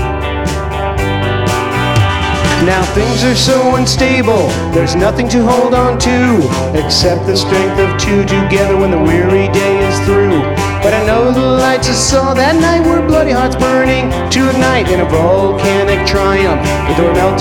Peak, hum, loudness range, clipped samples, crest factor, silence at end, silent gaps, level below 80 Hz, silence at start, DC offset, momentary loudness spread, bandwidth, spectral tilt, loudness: 0 dBFS; none; 1 LU; under 0.1%; 10 dB; 0 s; none; -24 dBFS; 0 s; under 0.1%; 4 LU; 18 kHz; -5 dB/octave; -11 LUFS